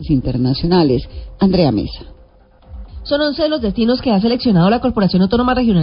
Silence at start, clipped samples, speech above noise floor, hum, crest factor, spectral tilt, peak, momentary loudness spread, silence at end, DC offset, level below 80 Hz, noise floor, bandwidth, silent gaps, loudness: 0 s; under 0.1%; 32 dB; none; 14 dB; -12 dB/octave; -2 dBFS; 9 LU; 0 s; under 0.1%; -32 dBFS; -46 dBFS; 5.4 kHz; none; -15 LUFS